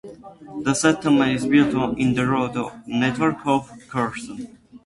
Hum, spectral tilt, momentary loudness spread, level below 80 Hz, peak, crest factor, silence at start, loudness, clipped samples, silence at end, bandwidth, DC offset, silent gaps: none; -5 dB/octave; 17 LU; -52 dBFS; -4 dBFS; 18 dB; 0.05 s; -21 LUFS; under 0.1%; 0.1 s; 11.5 kHz; under 0.1%; none